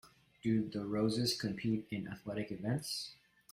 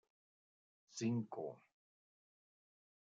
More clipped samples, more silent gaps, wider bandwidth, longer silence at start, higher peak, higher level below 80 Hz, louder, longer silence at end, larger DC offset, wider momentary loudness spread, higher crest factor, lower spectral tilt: neither; neither; first, 16 kHz vs 7.4 kHz; second, 0.05 s vs 0.9 s; first, -22 dBFS vs -28 dBFS; first, -68 dBFS vs under -90 dBFS; first, -37 LUFS vs -44 LUFS; second, 0.4 s vs 1.6 s; neither; second, 9 LU vs 14 LU; about the same, 16 dB vs 20 dB; second, -5.5 dB/octave vs -7 dB/octave